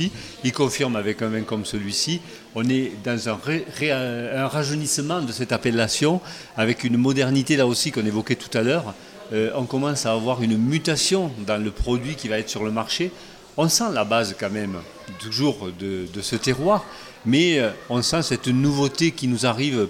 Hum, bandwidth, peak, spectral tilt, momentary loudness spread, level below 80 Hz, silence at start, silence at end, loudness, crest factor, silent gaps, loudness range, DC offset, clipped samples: none; 16.5 kHz; -4 dBFS; -4.5 dB/octave; 9 LU; -46 dBFS; 0 s; 0 s; -23 LUFS; 18 dB; none; 3 LU; under 0.1%; under 0.1%